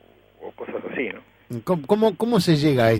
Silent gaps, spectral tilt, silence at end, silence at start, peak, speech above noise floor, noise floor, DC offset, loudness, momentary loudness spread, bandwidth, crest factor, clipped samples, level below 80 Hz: none; -6.5 dB/octave; 0 s; 0.4 s; -4 dBFS; 21 dB; -42 dBFS; under 0.1%; -22 LUFS; 20 LU; 16 kHz; 18 dB; under 0.1%; -56 dBFS